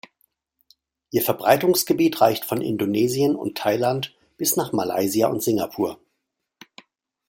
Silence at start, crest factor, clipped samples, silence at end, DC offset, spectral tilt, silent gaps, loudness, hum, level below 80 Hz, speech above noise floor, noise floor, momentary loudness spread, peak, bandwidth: 1.15 s; 20 dB; under 0.1%; 1.35 s; under 0.1%; -4.5 dB/octave; none; -22 LUFS; none; -64 dBFS; 57 dB; -78 dBFS; 8 LU; -2 dBFS; 17 kHz